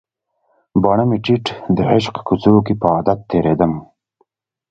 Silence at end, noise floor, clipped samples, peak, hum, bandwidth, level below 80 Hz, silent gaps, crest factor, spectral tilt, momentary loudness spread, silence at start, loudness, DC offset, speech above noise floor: 0.85 s; -65 dBFS; under 0.1%; 0 dBFS; none; 8 kHz; -44 dBFS; none; 16 dB; -8 dB/octave; 6 LU; 0.75 s; -16 LUFS; under 0.1%; 50 dB